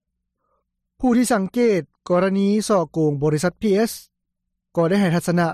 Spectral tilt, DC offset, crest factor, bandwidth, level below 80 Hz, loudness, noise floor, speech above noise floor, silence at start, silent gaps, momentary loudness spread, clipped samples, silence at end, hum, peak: -6 dB/octave; under 0.1%; 12 dB; 15.5 kHz; -52 dBFS; -20 LUFS; -77 dBFS; 59 dB; 1 s; none; 6 LU; under 0.1%; 0 s; none; -8 dBFS